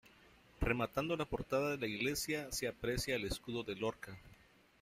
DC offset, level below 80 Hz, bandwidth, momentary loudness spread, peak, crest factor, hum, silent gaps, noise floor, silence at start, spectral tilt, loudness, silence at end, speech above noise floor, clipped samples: under 0.1%; -54 dBFS; 15.5 kHz; 6 LU; -20 dBFS; 20 dB; none; none; -65 dBFS; 0.05 s; -4 dB/octave; -39 LUFS; 0.45 s; 26 dB; under 0.1%